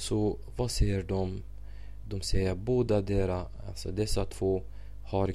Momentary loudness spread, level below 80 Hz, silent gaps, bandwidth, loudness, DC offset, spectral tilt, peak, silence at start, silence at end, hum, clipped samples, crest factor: 19 LU; -38 dBFS; none; 13.5 kHz; -32 LUFS; 0.7%; -6 dB/octave; -14 dBFS; 0 s; 0 s; none; under 0.1%; 16 dB